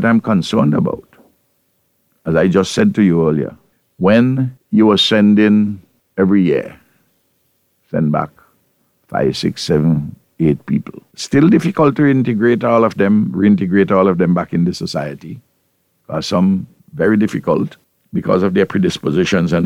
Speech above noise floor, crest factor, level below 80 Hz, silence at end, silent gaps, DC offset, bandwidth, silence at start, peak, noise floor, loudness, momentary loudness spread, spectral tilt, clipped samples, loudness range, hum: 50 dB; 14 dB; -48 dBFS; 0 s; none; under 0.1%; 11.5 kHz; 0 s; 0 dBFS; -63 dBFS; -15 LUFS; 13 LU; -6.5 dB/octave; under 0.1%; 6 LU; none